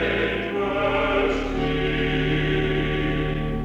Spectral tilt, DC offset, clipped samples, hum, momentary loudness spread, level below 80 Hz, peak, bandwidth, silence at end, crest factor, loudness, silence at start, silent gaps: -7 dB/octave; under 0.1%; under 0.1%; none; 3 LU; -32 dBFS; -10 dBFS; 8 kHz; 0 s; 12 dB; -23 LUFS; 0 s; none